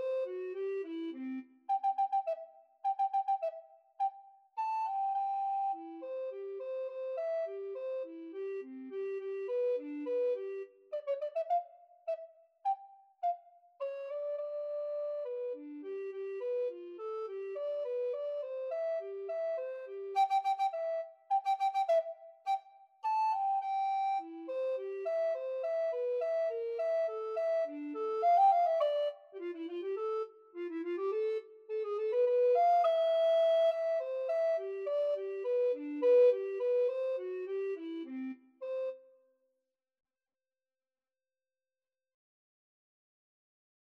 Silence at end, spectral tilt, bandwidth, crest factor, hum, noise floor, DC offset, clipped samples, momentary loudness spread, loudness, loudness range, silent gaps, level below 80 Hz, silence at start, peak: 4.85 s; -3 dB/octave; 7.4 kHz; 16 dB; none; under -90 dBFS; under 0.1%; under 0.1%; 13 LU; -35 LUFS; 9 LU; none; under -90 dBFS; 0 s; -20 dBFS